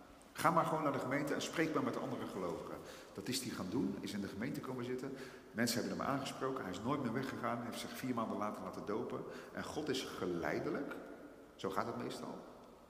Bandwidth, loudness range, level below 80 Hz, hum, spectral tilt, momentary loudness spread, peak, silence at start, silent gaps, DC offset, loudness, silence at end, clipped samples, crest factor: 15.5 kHz; 4 LU; -72 dBFS; none; -5 dB/octave; 11 LU; -16 dBFS; 0 s; none; under 0.1%; -40 LUFS; 0 s; under 0.1%; 24 dB